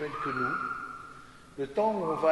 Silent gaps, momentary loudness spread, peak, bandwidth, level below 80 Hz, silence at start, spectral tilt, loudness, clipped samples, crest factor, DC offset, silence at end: none; 19 LU; -12 dBFS; 11.5 kHz; -62 dBFS; 0 s; -6.5 dB/octave; -31 LUFS; under 0.1%; 18 dB; under 0.1%; 0 s